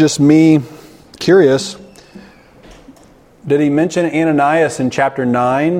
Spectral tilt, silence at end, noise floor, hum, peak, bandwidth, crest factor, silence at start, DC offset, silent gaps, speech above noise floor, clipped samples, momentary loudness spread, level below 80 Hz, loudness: -6 dB/octave; 0 s; -45 dBFS; none; 0 dBFS; 12 kHz; 14 dB; 0 s; under 0.1%; none; 33 dB; under 0.1%; 12 LU; -52 dBFS; -13 LUFS